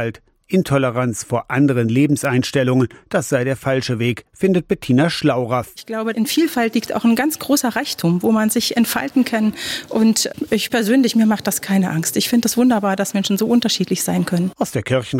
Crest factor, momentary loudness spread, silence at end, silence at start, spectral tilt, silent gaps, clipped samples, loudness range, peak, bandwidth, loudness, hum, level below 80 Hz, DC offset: 12 dB; 5 LU; 0 s; 0 s; -5 dB/octave; none; under 0.1%; 2 LU; -6 dBFS; 17 kHz; -18 LUFS; none; -54 dBFS; under 0.1%